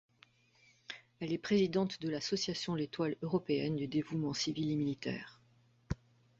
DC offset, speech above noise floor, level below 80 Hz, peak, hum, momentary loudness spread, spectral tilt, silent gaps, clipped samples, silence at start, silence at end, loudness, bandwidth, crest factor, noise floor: under 0.1%; 33 dB; -60 dBFS; -18 dBFS; none; 12 LU; -5.5 dB/octave; none; under 0.1%; 0.9 s; 0.45 s; -36 LUFS; 8 kHz; 18 dB; -69 dBFS